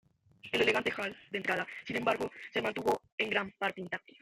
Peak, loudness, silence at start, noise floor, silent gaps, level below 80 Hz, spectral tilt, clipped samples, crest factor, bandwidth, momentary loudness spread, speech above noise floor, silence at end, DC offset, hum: -14 dBFS; -33 LUFS; 0.45 s; -56 dBFS; 3.12-3.18 s; -70 dBFS; -4 dB/octave; under 0.1%; 20 dB; 16 kHz; 9 LU; 22 dB; 0.25 s; under 0.1%; none